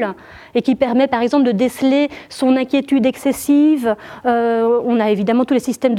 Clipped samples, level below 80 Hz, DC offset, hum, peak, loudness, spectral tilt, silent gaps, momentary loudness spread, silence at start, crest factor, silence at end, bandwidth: under 0.1%; -56 dBFS; under 0.1%; none; -2 dBFS; -16 LUFS; -5.5 dB/octave; none; 6 LU; 0 s; 14 dB; 0 s; 15.5 kHz